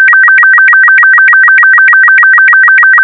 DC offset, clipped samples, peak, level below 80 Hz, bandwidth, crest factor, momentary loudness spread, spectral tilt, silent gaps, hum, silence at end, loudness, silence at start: under 0.1%; under 0.1%; 0 dBFS; -58 dBFS; 4.4 kHz; 4 dB; 0 LU; -1.5 dB/octave; none; none; 0 s; -1 LUFS; 0 s